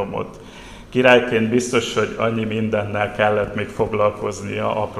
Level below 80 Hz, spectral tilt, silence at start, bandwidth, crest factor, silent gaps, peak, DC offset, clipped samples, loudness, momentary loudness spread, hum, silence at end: -46 dBFS; -5 dB/octave; 0 s; 13 kHz; 20 dB; none; 0 dBFS; 0.1%; under 0.1%; -19 LUFS; 14 LU; none; 0 s